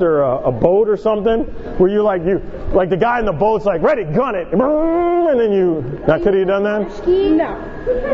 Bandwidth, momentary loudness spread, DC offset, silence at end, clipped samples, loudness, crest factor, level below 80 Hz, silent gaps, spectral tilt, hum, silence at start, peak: 6.8 kHz; 6 LU; under 0.1%; 0 s; under 0.1%; -16 LUFS; 16 dB; -34 dBFS; none; -9 dB/octave; none; 0 s; 0 dBFS